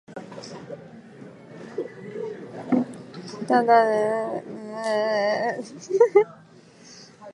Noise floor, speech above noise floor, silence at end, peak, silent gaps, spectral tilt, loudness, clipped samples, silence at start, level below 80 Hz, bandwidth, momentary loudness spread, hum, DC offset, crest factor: -50 dBFS; 28 dB; 0 s; -4 dBFS; none; -5.5 dB/octave; -23 LUFS; under 0.1%; 0.1 s; -76 dBFS; 11 kHz; 25 LU; none; under 0.1%; 20 dB